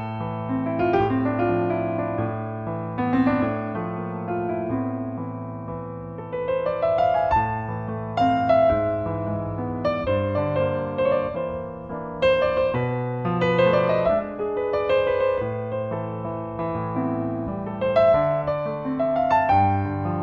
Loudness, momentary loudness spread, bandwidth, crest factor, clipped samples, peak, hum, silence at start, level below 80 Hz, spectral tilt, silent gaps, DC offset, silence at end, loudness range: -24 LUFS; 11 LU; 7 kHz; 16 dB; under 0.1%; -8 dBFS; none; 0 s; -46 dBFS; -9 dB/octave; none; under 0.1%; 0 s; 4 LU